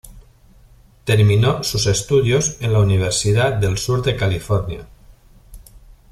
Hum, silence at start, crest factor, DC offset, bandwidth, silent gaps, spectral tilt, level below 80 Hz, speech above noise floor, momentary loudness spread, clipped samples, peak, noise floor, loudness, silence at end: none; 0.05 s; 16 dB; under 0.1%; 14 kHz; none; -5 dB/octave; -38 dBFS; 32 dB; 7 LU; under 0.1%; -2 dBFS; -48 dBFS; -17 LUFS; 0.35 s